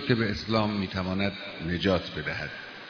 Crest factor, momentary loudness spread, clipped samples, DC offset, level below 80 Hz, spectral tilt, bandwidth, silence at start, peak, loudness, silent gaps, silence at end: 20 dB; 8 LU; under 0.1%; under 0.1%; -50 dBFS; -6.5 dB/octave; 5.4 kHz; 0 s; -8 dBFS; -29 LUFS; none; 0 s